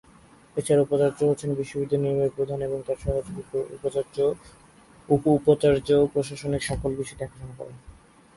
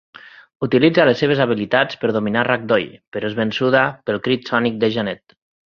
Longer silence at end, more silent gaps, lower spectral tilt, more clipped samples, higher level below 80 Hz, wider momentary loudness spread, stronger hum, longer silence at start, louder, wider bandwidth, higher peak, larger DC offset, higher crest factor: about the same, 0.45 s vs 0.5 s; second, none vs 3.07-3.12 s; about the same, -6.5 dB/octave vs -7 dB/octave; neither; first, -46 dBFS vs -56 dBFS; first, 14 LU vs 10 LU; neither; first, 0.55 s vs 0.25 s; second, -25 LUFS vs -18 LUFS; first, 11.5 kHz vs 7 kHz; second, -6 dBFS vs 0 dBFS; neither; about the same, 20 dB vs 18 dB